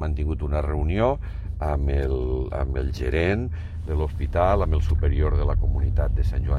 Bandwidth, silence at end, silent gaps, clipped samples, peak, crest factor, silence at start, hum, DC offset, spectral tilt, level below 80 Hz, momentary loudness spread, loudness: 6.2 kHz; 0 s; none; under 0.1%; -8 dBFS; 14 dB; 0 s; none; under 0.1%; -8.5 dB/octave; -24 dBFS; 5 LU; -25 LUFS